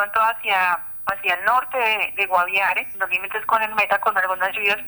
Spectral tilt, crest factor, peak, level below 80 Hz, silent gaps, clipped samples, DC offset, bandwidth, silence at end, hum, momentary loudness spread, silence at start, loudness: -2.5 dB/octave; 16 dB; -4 dBFS; -60 dBFS; none; under 0.1%; under 0.1%; over 20 kHz; 0 s; none; 4 LU; 0 s; -20 LUFS